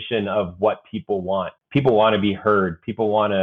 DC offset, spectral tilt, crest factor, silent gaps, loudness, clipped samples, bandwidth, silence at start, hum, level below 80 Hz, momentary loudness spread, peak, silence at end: under 0.1%; -9 dB/octave; 16 dB; none; -21 LUFS; under 0.1%; 4.6 kHz; 0 s; none; -54 dBFS; 9 LU; -4 dBFS; 0 s